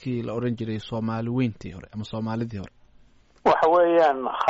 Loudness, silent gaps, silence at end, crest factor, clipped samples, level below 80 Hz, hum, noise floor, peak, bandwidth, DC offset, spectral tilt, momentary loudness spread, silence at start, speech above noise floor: -24 LUFS; none; 0 s; 16 dB; under 0.1%; -56 dBFS; none; -55 dBFS; -10 dBFS; 7.8 kHz; under 0.1%; -5.5 dB/octave; 19 LU; 0 s; 31 dB